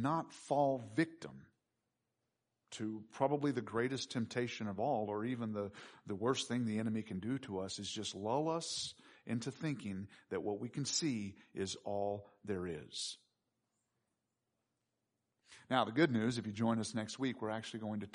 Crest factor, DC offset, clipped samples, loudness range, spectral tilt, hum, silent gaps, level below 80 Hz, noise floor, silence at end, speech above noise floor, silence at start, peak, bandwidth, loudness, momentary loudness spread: 22 dB; under 0.1%; under 0.1%; 6 LU; -5 dB/octave; none; none; -78 dBFS; -87 dBFS; 0.05 s; 49 dB; 0 s; -18 dBFS; 10.5 kHz; -39 LUFS; 9 LU